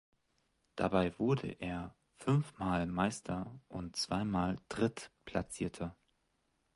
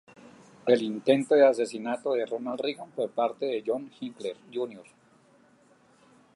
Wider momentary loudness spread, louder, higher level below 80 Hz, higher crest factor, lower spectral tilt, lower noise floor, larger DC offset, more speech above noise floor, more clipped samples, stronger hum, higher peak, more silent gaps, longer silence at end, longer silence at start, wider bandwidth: second, 12 LU vs 15 LU; second, -37 LUFS vs -28 LUFS; first, -58 dBFS vs -82 dBFS; about the same, 20 dB vs 20 dB; about the same, -6 dB/octave vs -5.5 dB/octave; first, -79 dBFS vs -61 dBFS; neither; first, 43 dB vs 34 dB; neither; neither; second, -16 dBFS vs -8 dBFS; neither; second, 0.8 s vs 1.55 s; about the same, 0.75 s vs 0.65 s; about the same, 11.5 kHz vs 11.5 kHz